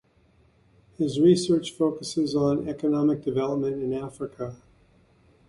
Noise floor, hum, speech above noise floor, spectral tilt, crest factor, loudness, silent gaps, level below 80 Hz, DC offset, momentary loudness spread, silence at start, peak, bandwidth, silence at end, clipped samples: -61 dBFS; none; 37 dB; -6.5 dB/octave; 18 dB; -25 LUFS; none; -60 dBFS; under 0.1%; 14 LU; 1 s; -8 dBFS; 11.5 kHz; 0.95 s; under 0.1%